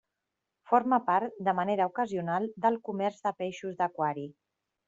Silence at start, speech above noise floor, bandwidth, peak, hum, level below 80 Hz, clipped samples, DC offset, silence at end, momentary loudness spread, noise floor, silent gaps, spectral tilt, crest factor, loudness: 0.7 s; 56 dB; 7.8 kHz; -10 dBFS; none; -76 dBFS; under 0.1%; under 0.1%; 0.55 s; 8 LU; -86 dBFS; none; -5 dB/octave; 20 dB; -30 LUFS